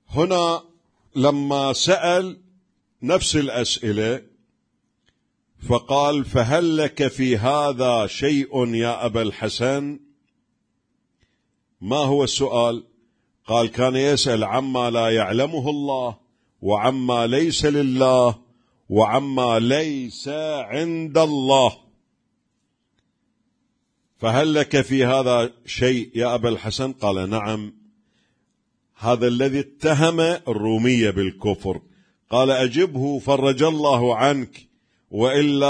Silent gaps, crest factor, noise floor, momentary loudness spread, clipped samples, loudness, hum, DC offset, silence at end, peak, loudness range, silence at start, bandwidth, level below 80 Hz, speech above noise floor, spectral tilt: none; 20 dB; -72 dBFS; 8 LU; under 0.1%; -20 LUFS; none; under 0.1%; 0 s; -2 dBFS; 5 LU; 0.1 s; 10.5 kHz; -50 dBFS; 52 dB; -5 dB/octave